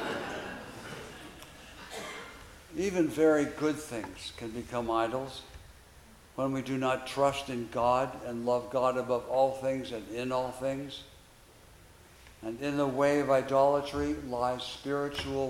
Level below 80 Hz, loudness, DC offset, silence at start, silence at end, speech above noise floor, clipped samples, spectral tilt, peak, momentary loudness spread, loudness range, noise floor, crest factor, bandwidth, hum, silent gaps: -58 dBFS; -31 LUFS; under 0.1%; 0 s; 0 s; 26 dB; under 0.1%; -5.5 dB/octave; -14 dBFS; 18 LU; 5 LU; -56 dBFS; 18 dB; 16.5 kHz; none; none